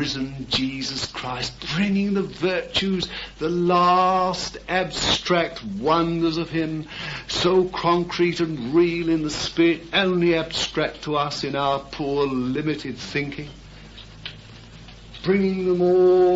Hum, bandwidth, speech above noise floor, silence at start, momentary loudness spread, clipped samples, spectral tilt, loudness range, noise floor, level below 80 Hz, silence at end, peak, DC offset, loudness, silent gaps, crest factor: none; 8 kHz; 21 dB; 0 s; 11 LU; under 0.1%; -5 dB/octave; 6 LU; -43 dBFS; -46 dBFS; 0 s; -6 dBFS; under 0.1%; -22 LUFS; none; 16 dB